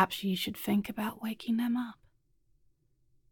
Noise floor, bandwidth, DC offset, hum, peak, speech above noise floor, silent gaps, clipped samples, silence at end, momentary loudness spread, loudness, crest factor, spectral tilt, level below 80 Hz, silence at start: -70 dBFS; 17.5 kHz; under 0.1%; none; -12 dBFS; 37 dB; none; under 0.1%; 1.4 s; 6 LU; -33 LUFS; 22 dB; -5 dB/octave; -68 dBFS; 0 s